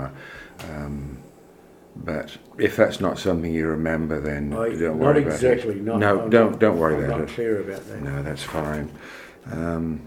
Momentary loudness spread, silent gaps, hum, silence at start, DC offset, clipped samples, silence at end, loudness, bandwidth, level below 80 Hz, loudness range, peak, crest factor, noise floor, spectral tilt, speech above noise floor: 17 LU; none; none; 0 s; under 0.1%; under 0.1%; 0 s; -23 LUFS; 16.5 kHz; -44 dBFS; 6 LU; -2 dBFS; 22 dB; -49 dBFS; -7 dB/octave; 27 dB